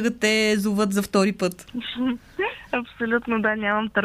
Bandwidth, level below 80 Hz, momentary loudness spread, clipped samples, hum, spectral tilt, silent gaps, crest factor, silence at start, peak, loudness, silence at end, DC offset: 15.5 kHz; -54 dBFS; 8 LU; under 0.1%; none; -4.5 dB/octave; none; 18 dB; 0 s; -4 dBFS; -23 LUFS; 0 s; under 0.1%